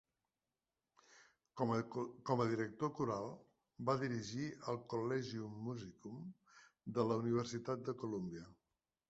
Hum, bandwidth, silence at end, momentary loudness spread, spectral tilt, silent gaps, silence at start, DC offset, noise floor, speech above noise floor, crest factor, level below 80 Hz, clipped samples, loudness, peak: none; 8 kHz; 0.55 s; 15 LU; -6.5 dB/octave; none; 1.1 s; under 0.1%; under -90 dBFS; over 49 dB; 22 dB; -76 dBFS; under 0.1%; -42 LUFS; -22 dBFS